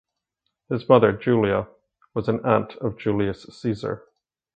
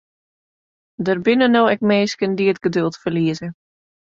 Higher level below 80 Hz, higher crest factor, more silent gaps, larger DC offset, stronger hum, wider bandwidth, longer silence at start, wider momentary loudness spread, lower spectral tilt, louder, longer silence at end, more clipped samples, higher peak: first, -54 dBFS vs -60 dBFS; first, 24 dB vs 16 dB; neither; neither; neither; first, 8.6 kHz vs 7.6 kHz; second, 0.7 s vs 1 s; first, 14 LU vs 9 LU; first, -8.5 dB/octave vs -6 dB/octave; second, -23 LUFS vs -18 LUFS; about the same, 0.6 s vs 0.6 s; neither; about the same, 0 dBFS vs -2 dBFS